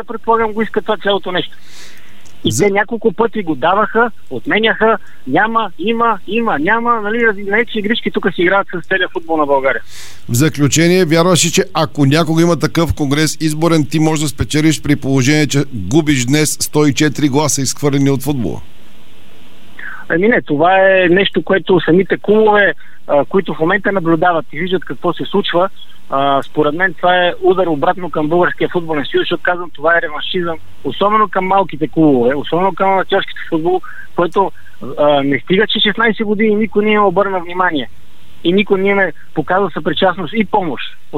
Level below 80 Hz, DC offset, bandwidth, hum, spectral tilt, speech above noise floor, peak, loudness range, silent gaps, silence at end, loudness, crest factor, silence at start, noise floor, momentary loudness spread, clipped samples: -42 dBFS; 7%; 16.5 kHz; none; -4.5 dB/octave; 30 dB; 0 dBFS; 3 LU; none; 0 s; -14 LUFS; 14 dB; 0 s; -44 dBFS; 8 LU; under 0.1%